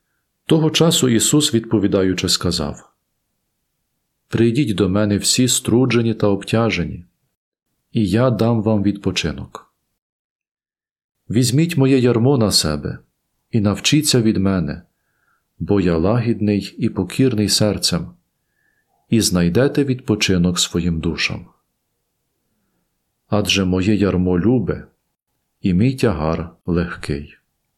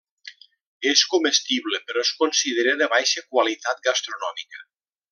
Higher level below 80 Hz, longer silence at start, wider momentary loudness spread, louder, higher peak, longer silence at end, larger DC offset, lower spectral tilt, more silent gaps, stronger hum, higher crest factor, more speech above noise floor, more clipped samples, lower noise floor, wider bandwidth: first, -46 dBFS vs -78 dBFS; first, 0.5 s vs 0.25 s; about the same, 12 LU vs 11 LU; first, -17 LUFS vs -21 LUFS; about the same, -2 dBFS vs -4 dBFS; about the same, 0.5 s vs 0.5 s; neither; first, -5 dB/octave vs 1 dB/octave; first, 7.37-7.52 s, 10.02-10.39 s, 10.51-10.55 s, 10.91-10.96 s, 11.04-11.09 s vs 0.61-0.80 s; neither; about the same, 16 dB vs 20 dB; first, 56 dB vs 24 dB; neither; first, -72 dBFS vs -46 dBFS; first, 16 kHz vs 11 kHz